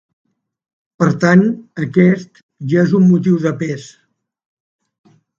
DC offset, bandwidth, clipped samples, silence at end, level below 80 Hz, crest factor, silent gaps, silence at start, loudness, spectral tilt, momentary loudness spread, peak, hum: under 0.1%; 7.4 kHz; under 0.1%; 1.5 s; -58 dBFS; 16 dB; 2.43-2.49 s; 1 s; -14 LUFS; -8 dB/octave; 12 LU; 0 dBFS; none